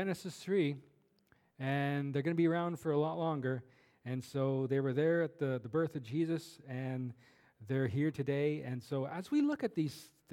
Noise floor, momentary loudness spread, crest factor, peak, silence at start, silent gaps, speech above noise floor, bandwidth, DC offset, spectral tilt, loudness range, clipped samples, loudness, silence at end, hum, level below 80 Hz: -72 dBFS; 10 LU; 16 dB; -20 dBFS; 0 s; none; 37 dB; 15.5 kHz; under 0.1%; -7.5 dB/octave; 2 LU; under 0.1%; -36 LUFS; 0.25 s; none; -78 dBFS